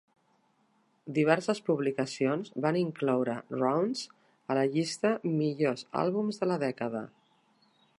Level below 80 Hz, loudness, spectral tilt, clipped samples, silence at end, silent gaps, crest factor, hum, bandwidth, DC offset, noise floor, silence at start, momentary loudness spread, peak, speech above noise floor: -80 dBFS; -30 LUFS; -6 dB/octave; under 0.1%; 0.9 s; none; 22 dB; none; 11.5 kHz; under 0.1%; -70 dBFS; 1.05 s; 8 LU; -8 dBFS; 41 dB